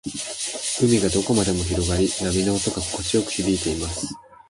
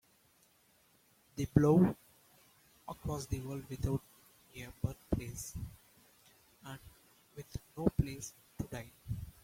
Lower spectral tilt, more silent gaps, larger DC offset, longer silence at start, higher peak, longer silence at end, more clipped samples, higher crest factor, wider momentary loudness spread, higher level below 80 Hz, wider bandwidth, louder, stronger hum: second, -4 dB/octave vs -7 dB/octave; neither; neither; second, 0.05 s vs 1.35 s; first, -6 dBFS vs -12 dBFS; about the same, 0.15 s vs 0.15 s; neither; second, 16 dB vs 26 dB; second, 8 LU vs 22 LU; first, -38 dBFS vs -52 dBFS; second, 11.5 kHz vs 16.5 kHz; first, -22 LUFS vs -36 LUFS; neither